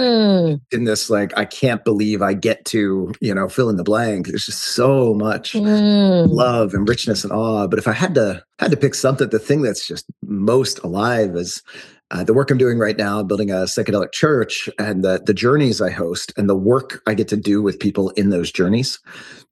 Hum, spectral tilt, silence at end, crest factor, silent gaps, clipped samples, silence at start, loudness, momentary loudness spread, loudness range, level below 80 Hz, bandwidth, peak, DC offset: none; -5.5 dB/octave; 0.15 s; 16 dB; none; under 0.1%; 0 s; -18 LUFS; 8 LU; 3 LU; -54 dBFS; 12.5 kHz; -2 dBFS; under 0.1%